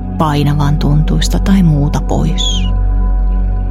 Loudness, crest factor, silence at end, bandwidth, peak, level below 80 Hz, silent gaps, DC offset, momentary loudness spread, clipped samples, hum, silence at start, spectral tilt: -13 LUFS; 10 dB; 0 s; 13 kHz; 0 dBFS; -14 dBFS; none; under 0.1%; 5 LU; under 0.1%; none; 0 s; -6 dB/octave